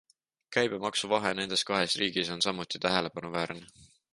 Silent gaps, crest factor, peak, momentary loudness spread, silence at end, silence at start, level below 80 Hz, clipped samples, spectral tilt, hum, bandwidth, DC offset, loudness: none; 22 dB; -10 dBFS; 7 LU; 0.3 s; 0.5 s; -66 dBFS; under 0.1%; -3 dB/octave; none; 11.5 kHz; under 0.1%; -30 LUFS